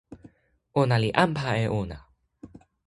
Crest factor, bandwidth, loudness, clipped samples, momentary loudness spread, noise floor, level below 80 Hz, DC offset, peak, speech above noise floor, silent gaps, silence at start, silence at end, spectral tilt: 26 dB; 11.5 kHz; -25 LUFS; under 0.1%; 12 LU; -61 dBFS; -52 dBFS; under 0.1%; -2 dBFS; 37 dB; none; 0.1 s; 0.4 s; -7 dB/octave